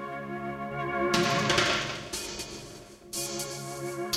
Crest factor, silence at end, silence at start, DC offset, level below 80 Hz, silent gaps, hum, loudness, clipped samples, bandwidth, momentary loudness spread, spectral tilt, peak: 20 dB; 0 s; 0 s; under 0.1%; -56 dBFS; none; none; -30 LUFS; under 0.1%; 16.5 kHz; 14 LU; -3 dB/octave; -10 dBFS